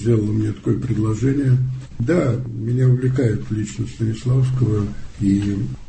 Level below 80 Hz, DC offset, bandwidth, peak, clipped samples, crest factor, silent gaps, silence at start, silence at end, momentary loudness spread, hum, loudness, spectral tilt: -38 dBFS; under 0.1%; 8.6 kHz; -6 dBFS; under 0.1%; 14 dB; none; 0 s; 0.05 s; 7 LU; none; -20 LUFS; -8.5 dB/octave